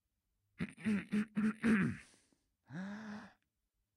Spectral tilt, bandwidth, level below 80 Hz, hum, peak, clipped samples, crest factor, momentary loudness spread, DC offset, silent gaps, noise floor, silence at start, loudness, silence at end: -7 dB/octave; 11 kHz; -70 dBFS; none; -22 dBFS; under 0.1%; 18 dB; 18 LU; under 0.1%; none; -86 dBFS; 0.6 s; -38 LUFS; 0.65 s